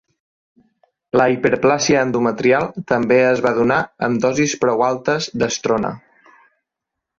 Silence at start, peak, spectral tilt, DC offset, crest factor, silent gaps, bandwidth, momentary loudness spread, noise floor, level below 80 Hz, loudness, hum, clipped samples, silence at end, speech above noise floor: 1.15 s; -2 dBFS; -4.5 dB/octave; under 0.1%; 16 dB; none; 7.6 kHz; 6 LU; -82 dBFS; -54 dBFS; -17 LUFS; none; under 0.1%; 1.2 s; 65 dB